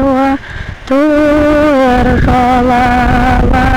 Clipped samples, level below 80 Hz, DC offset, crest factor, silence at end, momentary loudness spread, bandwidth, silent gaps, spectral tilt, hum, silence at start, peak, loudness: under 0.1%; -18 dBFS; under 0.1%; 4 dB; 0 s; 6 LU; 15.5 kHz; none; -7 dB/octave; none; 0 s; -4 dBFS; -10 LUFS